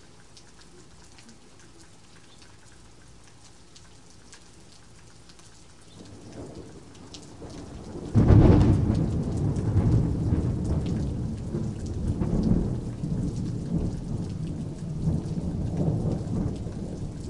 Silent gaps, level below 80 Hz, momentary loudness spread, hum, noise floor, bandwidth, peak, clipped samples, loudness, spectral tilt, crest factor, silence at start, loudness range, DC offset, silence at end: none; -36 dBFS; 21 LU; none; -53 dBFS; 11 kHz; -4 dBFS; under 0.1%; -26 LUFS; -8.5 dB/octave; 22 dB; 0.35 s; 23 LU; 0.3%; 0 s